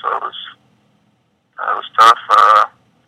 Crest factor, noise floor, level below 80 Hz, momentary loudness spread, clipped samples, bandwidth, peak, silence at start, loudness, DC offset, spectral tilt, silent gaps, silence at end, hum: 16 dB; -61 dBFS; -70 dBFS; 19 LU; under 0.1%; 15 kHz; 0 dBFS; 0.05 s; -12 LUFS; under 0.1%; -0.5 dB/octave; none; 0.4 s; none